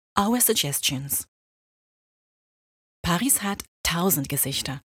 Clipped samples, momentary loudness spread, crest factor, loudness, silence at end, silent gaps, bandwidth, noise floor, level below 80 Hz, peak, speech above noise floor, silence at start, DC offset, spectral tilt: under 0.1%; 8 LU; 24 dB; -23 LUFS; 0.1 s; 1.28-3.04 s, 3.68-3.84 s; 18 kHz; under -90 dBFS; -50 dBFS; -2 dBFS; over 66 dB; 0.15 s; under 0.1%; -3 dB/octave